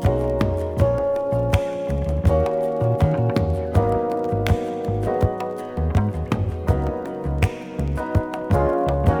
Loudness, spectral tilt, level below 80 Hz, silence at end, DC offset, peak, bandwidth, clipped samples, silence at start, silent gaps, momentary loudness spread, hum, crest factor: -22 LUFS; -8 dB/octave; -30 dBFS; 0 s; under 0.1%; -4 dBFS; 15.5 kHz; under 0.1%; 0 s; none; 6 LU; none; 18 dB